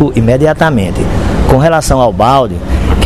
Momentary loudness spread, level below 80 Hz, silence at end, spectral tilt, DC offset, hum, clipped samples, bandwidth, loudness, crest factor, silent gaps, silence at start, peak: 6 LU; -18 dBFS; 0 s; -6.5 dB/octave; under 0.1%; none; 0.7%; 13.5 kHz; -10 LUFS; 10 dB; none; 0 s; 0 dBFS